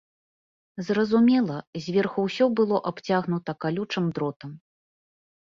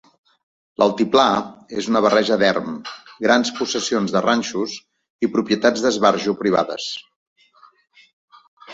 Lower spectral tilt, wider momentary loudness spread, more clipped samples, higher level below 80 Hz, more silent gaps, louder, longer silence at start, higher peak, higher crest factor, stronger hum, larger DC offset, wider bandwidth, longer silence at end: first, -7 dB/octave vs -4 dB/octave; about the same, 13 LU vs 13 LU; neither; about the same, -66 dBFS vs -62 dBFS; second, 1.67-1.73 s, 4.36-4.40 s vs 5.10-5.19 s, 7.16-7.36 s, 8.13-8.28 s, 8.48-8.57 s; second, -25 LUFS vs -19 LUFS; about the same, 0.75 s vs 0.8 s; second, -10 dBFS vs -2 dBFS; about the same, 16 dB vs 20 dB; neither; neither; about the same, 7.4 kHz vs 7.8 kHz; first, 1 s vs 0 s